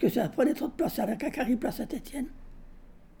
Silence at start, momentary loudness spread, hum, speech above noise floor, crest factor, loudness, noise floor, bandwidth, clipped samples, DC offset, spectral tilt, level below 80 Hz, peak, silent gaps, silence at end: 0 s; 10 LU; none; 20 dB; 18 dB; -30 LUFS; -50 dBFS; 20 kHz; under 0.1%; under 0.1%; -6 dB/octave; -50 dBFS; -12 dBFS; none; 0.1 s